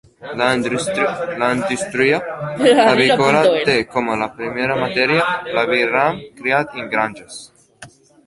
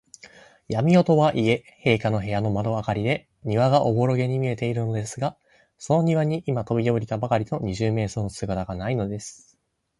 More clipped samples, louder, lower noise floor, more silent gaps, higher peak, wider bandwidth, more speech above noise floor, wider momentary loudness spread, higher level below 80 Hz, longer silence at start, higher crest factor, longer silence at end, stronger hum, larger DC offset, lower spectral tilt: neither; first, -17 LUFS vs -24 LUFS; second, -43 dBFS vs -67 dBFS; neither; about the same, -2 dBFS vs -4 dBFS; about the same, 11.5 kHz vs 11.5 kHz; second, 26 dB vs 44 dB; about the same, 10 LU vs 10 LU; about the same, -54 dBFS vs -50 dBFS; second, 0.2 s vs 0.7 s; about the same, 16 dB vs 20 dB; second, 0.4 s vs 0.65 s; neither; neither; second, -4.5 dB/octave vs -7 dB/octave